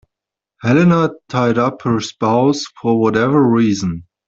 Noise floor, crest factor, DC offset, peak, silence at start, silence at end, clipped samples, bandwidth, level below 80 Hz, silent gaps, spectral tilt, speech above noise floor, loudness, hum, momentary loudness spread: -84 dBFS; 16 dB; under 0.1%; 0 dBFS; 0.65 s; 0.25 s; under 0.1%; 7.8 kHz; -52 dBFS; none; -6.5 dB/octave; 69 dB; -15 LUFS; none; 7 LU